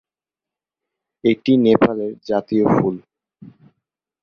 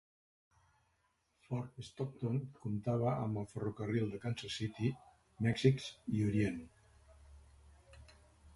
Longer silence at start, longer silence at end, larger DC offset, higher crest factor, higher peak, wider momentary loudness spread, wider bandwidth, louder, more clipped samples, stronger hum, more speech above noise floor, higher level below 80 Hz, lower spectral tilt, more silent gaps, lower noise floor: second, 1.25 s vs 1.5 s; first, 1.25 s vs 0.05 s; neither; second, 18 dB vs 24 dB; first, -2 dBFS vs -16 dBFS; about the same, 9 LU vs 11 LU; second, 6.6 kHz vs 11.5 kHz; first, -18 LUFS vs -38 LUFS; neither; neither; first, 72 dB vs 42 dB; first, -54 dBFS vs -64 dBFS; first, -8.5 dB/octave vs -7 dB/octave; neither; first, -89 dBFS vs -78 dBFS